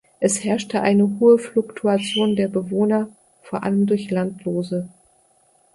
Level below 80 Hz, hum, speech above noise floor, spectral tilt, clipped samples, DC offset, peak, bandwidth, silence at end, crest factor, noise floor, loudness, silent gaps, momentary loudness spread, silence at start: -62 dBFS; none; 40 dB; -5.5 dB/octave; under 0.1%; under 0.1%; -4 dBFS; 11.5 kHz; 0.85 s; 16 dB; -59 dBFS; -20 LUFS; none; 11 LU; 0.2 s